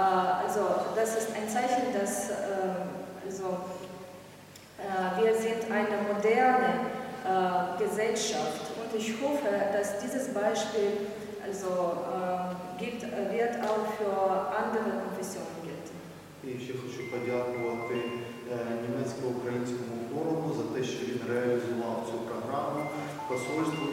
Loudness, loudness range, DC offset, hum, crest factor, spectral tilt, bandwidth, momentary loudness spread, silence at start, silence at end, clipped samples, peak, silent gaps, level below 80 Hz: -31 LUFS; 7 LU; under 0.1%; none; 18 dB; -4.5 dB/octave; 16.5 kHz; 11 LU; 0 s; 0 s; under 0.1%; -12 dBFS; none; -70 dBFS